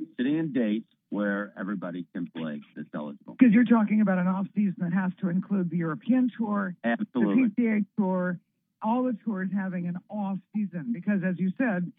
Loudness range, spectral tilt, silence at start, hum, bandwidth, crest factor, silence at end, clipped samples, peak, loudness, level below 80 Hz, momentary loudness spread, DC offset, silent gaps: 5 LU; -11.5 dB/octave; 0 s; none; 3.9 kHz; 20 dB; 0.05 s; under 0.1%; -6 dBFS; -27 LUFS; -86 dBFS; 13 LU; under 0.1%; none